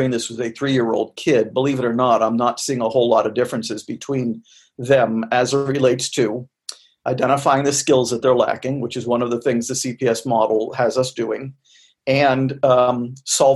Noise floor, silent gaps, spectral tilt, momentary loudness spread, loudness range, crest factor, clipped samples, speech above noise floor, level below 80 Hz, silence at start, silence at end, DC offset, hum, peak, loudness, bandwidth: -39 dBFS; none; -4.5 dB/octave; 10 LU; 2 LU; 16 dB; under 0.1%; 21 dB; -60 dBFS; 0 s; 0 s; under 0.1%; none; -2 dBFS; -19 LUFS; 12.5 kHz